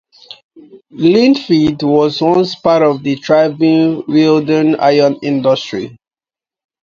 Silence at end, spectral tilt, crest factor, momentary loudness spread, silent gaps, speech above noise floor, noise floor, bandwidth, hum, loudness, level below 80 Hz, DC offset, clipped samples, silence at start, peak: 0.9 s; -7 dB/octave; 12 dB; 5 LU; 0.44-0.49 s; over 78 dB; under -90 dBFS; 7.2 kHz; none; -12 LUFS; -54 dBFS; under 0.1%; under 0.1%; 0.3 s; 0 dBFS